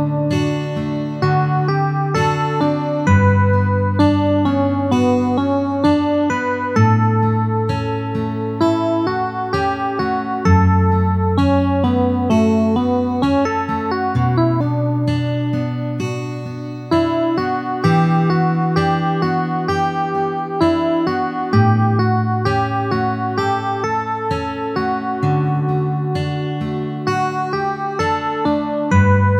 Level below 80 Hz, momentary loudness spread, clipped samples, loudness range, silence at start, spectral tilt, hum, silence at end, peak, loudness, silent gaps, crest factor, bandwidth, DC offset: -42 dBFS; 7 LU; under 0.1%; 4 LU; 0 s; -8 dB/octave; none; 0 s; -2 dBFS; -18 LUFS; none; 16 dB; 9 kHz; under 0.1%